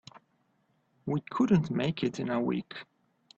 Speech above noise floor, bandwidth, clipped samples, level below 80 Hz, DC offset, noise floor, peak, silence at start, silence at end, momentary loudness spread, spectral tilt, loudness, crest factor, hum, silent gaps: 43 dB; 7.8 kHz; under 0.1%; -66 dBFS; under 0.1%; -72 dBFS; -12 dBFS; 1.05 s; 0.55 s; 17 LU; -7.5 dB/octave; -30 LUFS; 18 dB; none; none